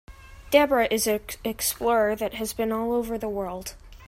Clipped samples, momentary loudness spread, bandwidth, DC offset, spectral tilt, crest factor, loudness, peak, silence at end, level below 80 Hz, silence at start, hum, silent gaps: under 0.1%; 11 LU; 16 kHz; under 0.1%; -3 dB/octave; 20 dB; -25 LUFS; -4 dBFS; 0 s; -48 dBFS; 0.1 s; none; none